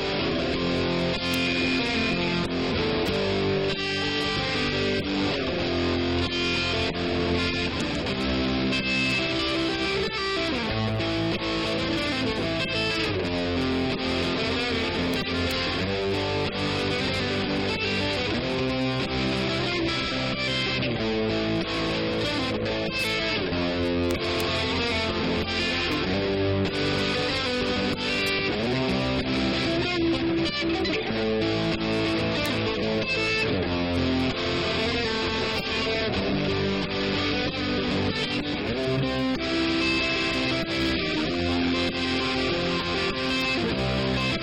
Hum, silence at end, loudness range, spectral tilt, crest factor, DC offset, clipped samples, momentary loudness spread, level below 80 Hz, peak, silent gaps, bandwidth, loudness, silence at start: none; 0 s; 1 LU; -5 dB/octave; 18 dB; 0.1%; under 0.1%; 2 LU; -42 dBFS; -8 dBFS; none; 16 kHz; -25 LUFS; 0 s